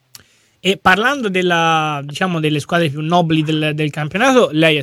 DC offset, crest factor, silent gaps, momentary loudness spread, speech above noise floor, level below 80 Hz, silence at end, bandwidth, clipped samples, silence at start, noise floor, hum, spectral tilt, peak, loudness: under 0.1%; 16 dB; none; 7 LU; 31 dB; -54 dBFS; 0 s; 16 kHz; under 0.1%; 0.65 s; -46 dBFS; none; -5 dB/octave; 0 dBFS; -15 LUFS